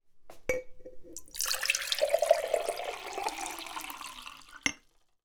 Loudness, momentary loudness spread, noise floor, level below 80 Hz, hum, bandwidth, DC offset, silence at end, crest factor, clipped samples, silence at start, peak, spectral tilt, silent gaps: -32 LUFS; 18 LU; -63 dBFS; -60 dBFS; none; over 20 kHz; under 0.1%; 0.5 s; 26 dB; under 0.1%; 0.1 s; -8 dBFS; -0.5 dB/octave; none